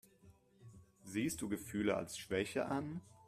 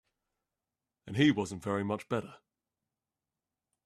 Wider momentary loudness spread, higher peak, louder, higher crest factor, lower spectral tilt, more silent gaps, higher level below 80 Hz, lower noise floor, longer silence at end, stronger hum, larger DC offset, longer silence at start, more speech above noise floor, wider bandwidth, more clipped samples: second, 7 LU vs 11 LU; second, -22 dBFS vs -14 dBFS; second, -40 LUFS vs -32 LUFS; about the same, 20 dB vs 22 dB; about the same, -5 dB/octave vs -6 dB/octave; neither; about the same, -70 dBFS vs -72 dBFS; second, -66 dBFS vs under -90 dBFS; second, 0 s vs 1.5 s; neither; neither; second, 0.25 s vs 1.05 s; second, 26 dB vs over 59 dB; first, 15.5 kHz vs 12 kHz; neither